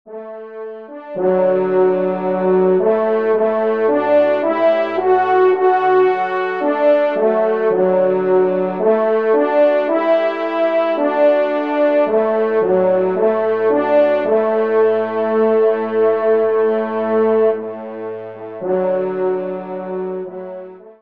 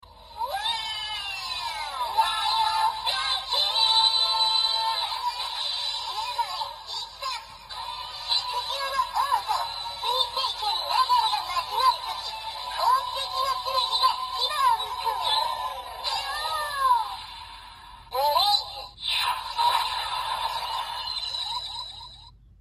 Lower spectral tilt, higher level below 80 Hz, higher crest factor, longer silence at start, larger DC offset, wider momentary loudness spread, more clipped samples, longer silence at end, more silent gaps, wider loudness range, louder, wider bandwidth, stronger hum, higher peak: first, -8.5 dB/octave vs 0.5 dB/octave; second, -70 dBFS vs -56 dBFS; second, 12 dB vs 18 dB; about the same, 0.05 s vs 0.1 s; first, 0.3% vs under 0.1%; about the same, 13 LU vs 12 LU; neither; second, 0.1 s vs 0.3 s; neither; second, 3 LU vs 6 LU; first, -16 LUFS vs -25 LUFS; second, 5.2 kHz vs 15 kHz; neither; first, -4 dBFS vs -10 dBFS